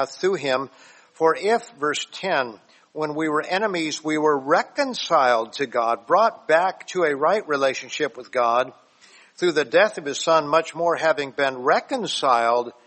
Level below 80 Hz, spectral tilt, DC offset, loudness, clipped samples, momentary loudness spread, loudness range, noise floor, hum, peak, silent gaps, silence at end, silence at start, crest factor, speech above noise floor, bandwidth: -72 dBFS; -3.5 dB/octave; under 0.1%; -22 LUFS; under 0.1%; 7 LU; 3 LU; -52 dBFS; none; -4 dBFS; none; 0.15 s; 0 s; 18 dB; 31 dB; 8.8 kHz